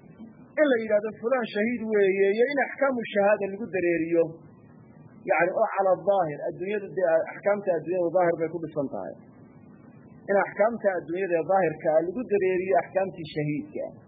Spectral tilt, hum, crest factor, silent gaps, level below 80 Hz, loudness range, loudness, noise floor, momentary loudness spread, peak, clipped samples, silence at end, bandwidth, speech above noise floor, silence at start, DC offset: -10.5 dB/octave; none; 16 dB; none; -68 dBFS; 3 LU; -26 LUFS; -51 dBFS; 8 LU; -10 dBFS; under 0.1%; 0.05 s; 5 kHz; 25 dB; 0.1 s; under 0.1%